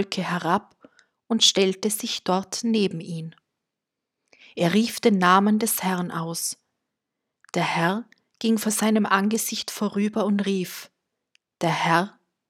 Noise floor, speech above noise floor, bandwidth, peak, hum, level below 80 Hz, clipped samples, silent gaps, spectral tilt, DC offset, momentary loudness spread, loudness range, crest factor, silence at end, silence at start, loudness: -85 dBFS; 62 dB; 16.5 kHz; -4 dBFS; none; -74 dBFS; under 0.1%; none; -4 dB/octave; under 0.1%; 13 LU; 3 LU; 22 dB; 0.4 s; 0 s; -23 LUFS